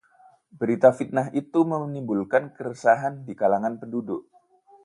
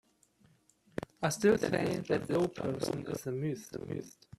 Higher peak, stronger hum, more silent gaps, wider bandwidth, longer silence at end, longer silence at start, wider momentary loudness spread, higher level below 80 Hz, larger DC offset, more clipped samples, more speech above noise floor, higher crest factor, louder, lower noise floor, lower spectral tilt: first, -4 dBFS vs -14 dBFS; neither; neither; second, 11 kHz vs 13.5 kHz; first, 0.65 s vs 0.3 s; second, 0.55 s vs 0.95 s; about the same, 12 LU vs 14 LU; second, -70 dBFS vs -64 dBFS; neither; neither; about the same, 33 dB vs 34 dB; about the same, 22 dB vs 20 dB; first, -24 LUFS vs -34 LUFS; second, -57 dBFS vs -67 dBFS; first, -8 dB/octave vs -5.5 dB/octave